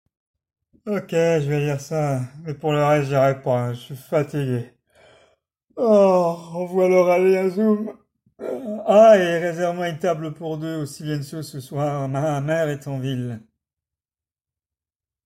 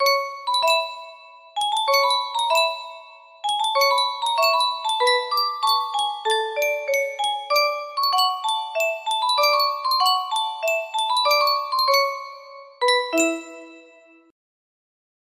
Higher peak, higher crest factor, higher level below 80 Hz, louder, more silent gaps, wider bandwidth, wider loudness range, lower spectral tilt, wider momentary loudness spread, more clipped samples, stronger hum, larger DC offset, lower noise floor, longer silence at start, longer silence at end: about the same, -4 dBFS vs -6 dBFS; about the same, 18 dB vs 16 dB; first, -60 dBFS vs -76 dBFS; about the same, -21 LUFS vs -21 LUFS; neither; about the same, 15.5 kHz vs 15.5 kHz; first, 8 LU vs 2 LU; first, -7 dB/octave vs 1 dB/octave; first, 15 LU vs 8 LU; neither; neither; neither; first, under -90 dBFS vs -51 dBFS; first, 0.85 s vs 0 s; first, 1.85 s vs 1.5 s